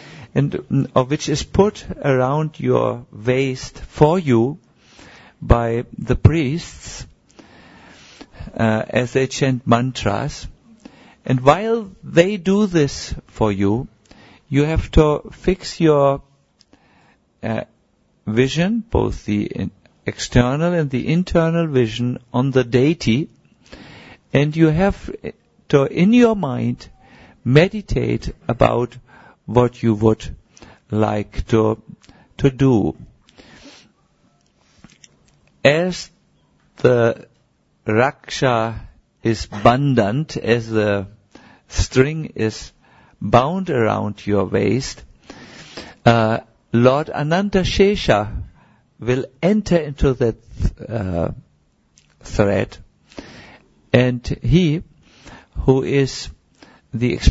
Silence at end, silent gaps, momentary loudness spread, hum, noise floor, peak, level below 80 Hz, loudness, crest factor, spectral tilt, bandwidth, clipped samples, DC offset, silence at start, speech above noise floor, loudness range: 0 s; none; 16 LU; none; -61 dBFS; 0 dBFS; -34 dBFS; -18 LUFS; 20 dB; -6.5 dB/octave; 8 kHz; under 0.1%; under 0.1%; 0 s; 43 dB; 5 LU